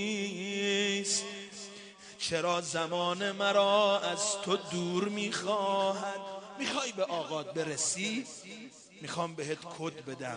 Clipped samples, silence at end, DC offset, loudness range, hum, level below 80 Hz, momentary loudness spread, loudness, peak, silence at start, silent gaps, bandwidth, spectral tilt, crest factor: under 0.1%; 0 s; under 0.1%; 5 LU; none; -76 dBFS; 15 LU; -32 LUFS; -14 dBFS; 0 s; none; 10.5 kHz; -3 dB/octave; 20 dB